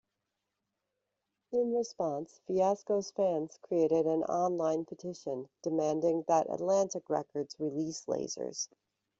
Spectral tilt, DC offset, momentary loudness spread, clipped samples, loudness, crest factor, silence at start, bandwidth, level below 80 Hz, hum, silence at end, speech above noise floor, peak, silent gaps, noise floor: -5.5 dB/octave; under 0.1%; 10 LU; under 0.1%; -33 LUFS; 18 dB; 1.5 s; 8 kHz; -76 dBFS; none; 0.55 s; 54 dB; -16 dBFS; none; -86 dBFS